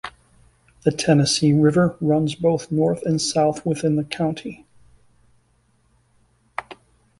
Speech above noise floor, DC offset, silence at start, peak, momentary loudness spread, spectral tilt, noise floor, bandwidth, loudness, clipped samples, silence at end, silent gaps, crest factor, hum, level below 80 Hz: 43 dB; under 0.1%; 0.05 s; -4 dBFS; 18 LU; -5.5 dB/octave; -62 dBFS; 11.5 kHz; -20 LUFS; under 0.1%; 0.45 s; none; 18 dB; none; -54 dBFS